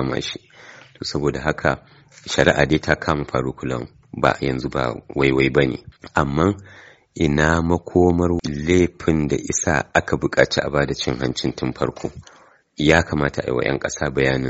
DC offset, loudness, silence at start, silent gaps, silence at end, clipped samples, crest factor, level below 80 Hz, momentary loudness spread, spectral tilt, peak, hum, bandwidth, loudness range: under 0.1%; -20 LUFS; 0 s; none; 0 s; under 0.1%; 20 dB; -38 dBFS; 10 LU; -4.5 dB/octave; 0 dBFS; none; 8 kHz; 3 LU